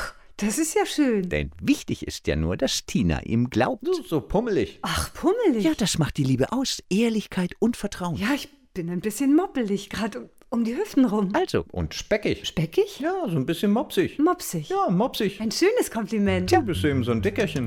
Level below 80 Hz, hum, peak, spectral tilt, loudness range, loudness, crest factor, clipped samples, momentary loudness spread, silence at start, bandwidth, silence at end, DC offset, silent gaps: -44 dBFS; none; -6 dBFS; -5 dB/octave; 2 LU; -24 LUFS; 18 dB; under 0.1%; 7 LU; 0 s; 17.5 kHz; 0 s; under 0.1%; none